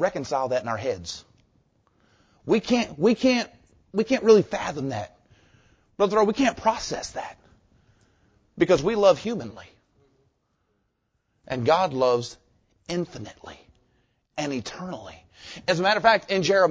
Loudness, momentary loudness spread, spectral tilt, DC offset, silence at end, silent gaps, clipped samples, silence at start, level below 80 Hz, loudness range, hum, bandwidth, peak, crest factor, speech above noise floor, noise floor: -24 LUFS; 20 LU; -5 dB/octave; under 0.1%; 0 s; none; under 0.1%; 0 s; -56 dBFS; 5 LU; none; 8 kHz; -4 dBFS; 22 dB; 51 dB; -74 dBFS